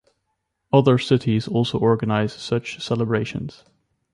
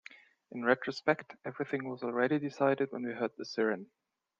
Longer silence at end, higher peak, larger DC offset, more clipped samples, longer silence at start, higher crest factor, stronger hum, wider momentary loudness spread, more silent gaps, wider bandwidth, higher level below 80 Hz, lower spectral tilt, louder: about the same, 0.65 s vs 0.55 s; first, -4 dBFS vs -12 dBFS; neither; neither; first, 0.75 s vs 0.5 s; second, 18 dB vs 24 dB; neither; about the same, 9 LU vs 10 LU; neither; first, 11 kHz vs 7.6 kHz; first, -54 dBFS vs -82 dBFS; about the same, -7 dB/octave vs -6.5 dB/octave; first, -21 LUFS vs -33 LUFS